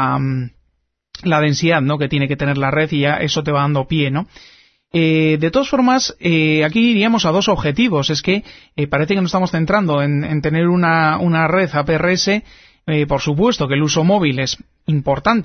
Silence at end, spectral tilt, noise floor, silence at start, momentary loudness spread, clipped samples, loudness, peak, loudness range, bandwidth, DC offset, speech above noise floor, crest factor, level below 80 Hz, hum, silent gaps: 0 s; -5.5 dB/octave; -66 dBFS; 0 s; 7 LU; under 0.1%; -16 LUFS; 0 dBFS; 2 LU; 6.6 kHz; under 0.1%; 51 dB; 16 dB; -42 dBFS; none; none